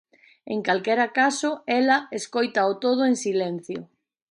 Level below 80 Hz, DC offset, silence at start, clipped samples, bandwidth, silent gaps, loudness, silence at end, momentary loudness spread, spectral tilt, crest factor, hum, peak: -76 dBFS; under 0.1%; 0.45 s; under 0.1%; 11 kHz; none; -23 LUFS; 0.45 s; 10 LU; -4 dB/octave; 18 dB; none; -8 dBFS